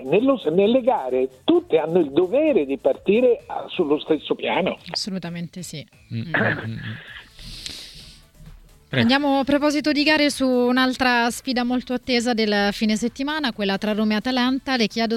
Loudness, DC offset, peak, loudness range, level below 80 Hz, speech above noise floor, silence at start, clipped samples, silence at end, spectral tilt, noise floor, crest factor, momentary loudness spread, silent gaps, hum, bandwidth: -21 LUFS; under 0.1%; -4 dBFS; 8 LU; -52 dBFS; 24 dB; 0 s; under 0.1%; 0 s; -5 dB/octave; -45 dBFS; 16 dB; 15 LU; none; none; 15.5 kHz